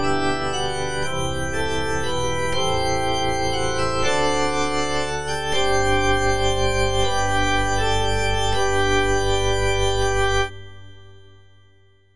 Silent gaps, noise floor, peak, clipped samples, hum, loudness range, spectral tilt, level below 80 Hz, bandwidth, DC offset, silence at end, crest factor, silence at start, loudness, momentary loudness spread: none; -56 dBFS; -6 dBFS; under 0.1%; none; 3 LU; -3.5 dB/octave; -32 dBFS; 10.5 kHz; 5%; 0 s; 16 dB; 0 s; -22 LUFS; 5 LU